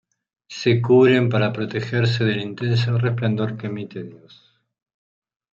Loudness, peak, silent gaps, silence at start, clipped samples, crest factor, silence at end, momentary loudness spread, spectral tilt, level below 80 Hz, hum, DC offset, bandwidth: -20 LUFS; -4 dBFS; none; 0.5 s; under 0.1%; 16 dB; 1.35 s; 17 LU; -7.5 dB/octave; -60 dBFS; none; under 0.1%; 7.2 kHz